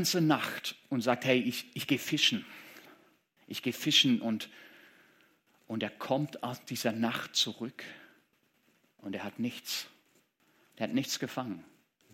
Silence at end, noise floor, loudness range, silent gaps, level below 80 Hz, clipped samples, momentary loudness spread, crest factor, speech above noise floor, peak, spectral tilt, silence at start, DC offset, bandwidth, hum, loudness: 0.5 s; -71 dBFS; 8 LU; none; -82 dBFS; under 0.1%; 18 LU; 24 dB; 39 dB; -10 dBFS; -3.5 dB/octave; 0 s; under 0.1%; 16.5 kHz; none; -32 LUFS